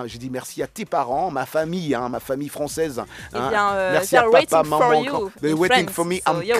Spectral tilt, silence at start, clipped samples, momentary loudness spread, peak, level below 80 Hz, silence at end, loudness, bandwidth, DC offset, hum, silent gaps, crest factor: -4 dB/octave; 0 s; under 0.1%; 13 LU; 0 dBFS; -52 dBFS; 0 s; -21 LUFS; 15.5 kHz; under 0.1%; none; none; 20 dB